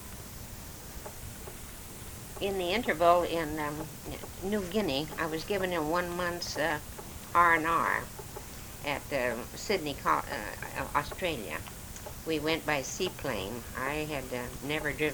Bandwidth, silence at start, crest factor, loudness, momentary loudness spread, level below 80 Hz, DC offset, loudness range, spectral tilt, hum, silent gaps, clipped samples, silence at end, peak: over 20 kHz; 0 s; 22 dB; -31 LUFS; 16 LU; -50 dBFS; under 0.1%; 4 LU; -4 dB/octave; none; none; under 0.1%; 0 s; -10 dBFS